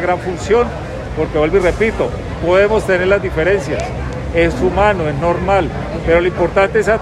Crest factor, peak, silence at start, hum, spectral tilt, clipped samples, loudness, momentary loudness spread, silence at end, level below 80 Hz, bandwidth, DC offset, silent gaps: 14 dB; 0 dBFS; 0 s; none; -6.5 dB/octave; under 0.1%; -15 LUFS; 8 LU; 0 s; -28 dBFS; 12.5 kHz; under 0.1%; none